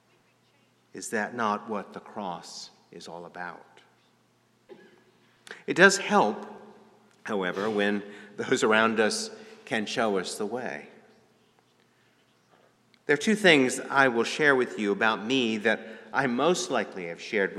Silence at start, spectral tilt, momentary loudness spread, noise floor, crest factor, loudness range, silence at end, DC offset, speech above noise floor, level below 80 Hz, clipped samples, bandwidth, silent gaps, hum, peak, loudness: 0.95 s; -3.5 dB/octave; 21 LU; -66 dBFS; 26 dB; 13 LU; 0 s; under 0.1%; 40 dB; -78 dBFS; under 0.1%; 14 kHz; none; 60 Hz at -70 dBFS; -2 dBFS; -26 LUFS